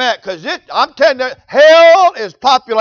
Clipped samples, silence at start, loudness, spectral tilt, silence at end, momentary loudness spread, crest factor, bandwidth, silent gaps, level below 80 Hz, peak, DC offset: under 0.1%; 0 s; -10 LUFS; -2 dB/octave; 0 s; 15 LU; 10 dB; 7 kHz; none; -58 dBFS; 0 dBFS; under 0.1%